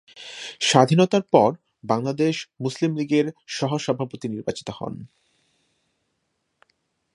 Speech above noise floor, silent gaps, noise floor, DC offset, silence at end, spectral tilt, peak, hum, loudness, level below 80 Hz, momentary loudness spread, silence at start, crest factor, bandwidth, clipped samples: 53 dB; none; -75 dBFS; under 0.1%; 2.1 s; -5 dB/octave; 0 dBFS; none; -22 LUFS; -64 dBFS; 17 LU; 0.15 s; 24 dB; 11.5 kHz; under 0.1%